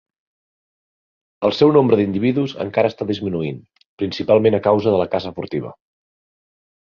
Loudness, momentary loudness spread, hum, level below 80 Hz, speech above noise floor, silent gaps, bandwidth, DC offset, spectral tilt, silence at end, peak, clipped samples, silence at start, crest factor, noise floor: -18 LUFS; 13 LU; none; -52 dBFS; over 72 dB; 3.86-3.98 s; 6.8 kHz; under 0.1%; -8 dB/octave; 1.1 s; -2 dBFS; under 0.1%; 1.4 s; 18 dB; under -90 dBFS